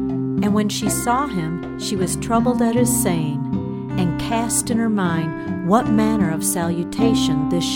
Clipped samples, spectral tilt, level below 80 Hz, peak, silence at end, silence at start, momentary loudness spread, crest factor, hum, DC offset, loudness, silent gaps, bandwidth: under 0.1%; -5 dB/octave; -42 dBFS; -4 dBFS; 0 s; 0 s; 8 LU; 16 dB; none; under 0.1%; -20 LUFS; none; 18 kHz